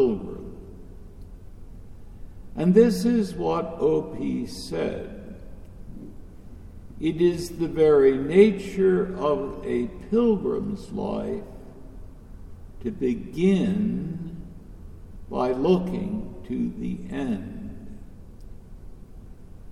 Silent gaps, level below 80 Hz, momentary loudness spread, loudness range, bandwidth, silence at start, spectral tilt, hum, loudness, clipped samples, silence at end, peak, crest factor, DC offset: none; -44 dBFS; 26 LU; 9 LU; 14 kHz; 0 s; -7.5 dB/octave; none; -24 LUFS; under 0.1%; 0 s; -4 dBFS; 20 dB; under 0.1%